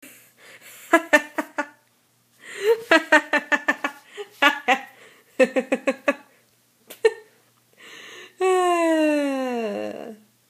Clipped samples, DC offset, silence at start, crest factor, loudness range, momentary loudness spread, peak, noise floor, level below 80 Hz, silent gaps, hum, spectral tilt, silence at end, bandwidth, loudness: under 0.1%; under 0.1%; 0.05 s; 24 dB; 5 LU; 22 LU; 0 dBFS; -63 dBFS; -78 dBFS; none; none; -2.5 dB/octave; 0.35 s; 15.5 kHz; -21 LUFS